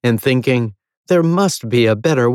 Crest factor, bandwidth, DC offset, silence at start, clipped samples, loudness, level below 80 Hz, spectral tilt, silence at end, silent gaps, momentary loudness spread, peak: 12 dB; 17 kHz; under 0.1%; 0.05 s; under 0.1%; -15 LUFS; -60 dBFS; -6 dB/octave; 0 s; 0.97-1.04 s; 4 LU; -4 dBFS